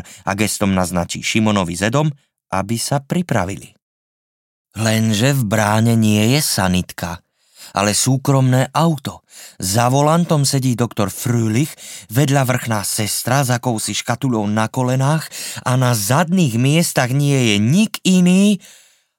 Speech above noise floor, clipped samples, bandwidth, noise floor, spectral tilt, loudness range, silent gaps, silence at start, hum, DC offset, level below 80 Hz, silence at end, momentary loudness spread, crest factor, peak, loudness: 27 dB; under 0.1%; 17 kHz; -44 dBFS; -5 dB/octave; 4 LU; 3.82-4.65 s; 0.05 s; none; under 0.1%; -52 dBFS; 0.6 s; 9 LU; 16 dB; -2 dBFS; -17 LUFS